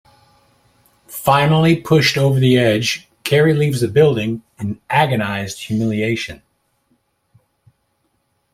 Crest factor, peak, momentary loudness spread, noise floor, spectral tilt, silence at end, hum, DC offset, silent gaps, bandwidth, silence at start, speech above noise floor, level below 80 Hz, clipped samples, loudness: 16 dB; -2 dBFS; 11 LU; -66 dBFS; -6 dB/octave; 2.2 s; none; under 0.1%; none; 16.5 kHz; 1.1 s; 51 dB; -52 dBFS; under 0.1%; -16 LUFS